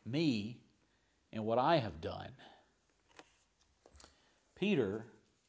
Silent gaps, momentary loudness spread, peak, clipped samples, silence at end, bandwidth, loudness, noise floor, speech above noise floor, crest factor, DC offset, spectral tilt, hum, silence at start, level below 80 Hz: none; 18 LU; -18 dBFS; under 0.1%; 0.4 s; 8 kHz; -36 LUFS; -75 dBFS; 40 dB; 22 dB; under 0.1%; -7 dB/octave; none; 0.05 s; -66 dBFS